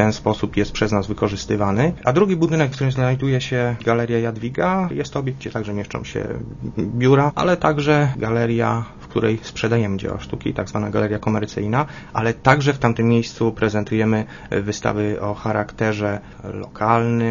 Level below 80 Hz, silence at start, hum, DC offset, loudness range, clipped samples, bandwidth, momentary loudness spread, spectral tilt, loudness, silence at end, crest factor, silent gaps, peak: -42 dBFS; 0 s; none; under 0.1%; 3 LU; under 0.1%; 7.4 kHz; 9 LU; -7 dB/octave; -20 LUFS; 0 s; 20 dB; none; 0 dBFS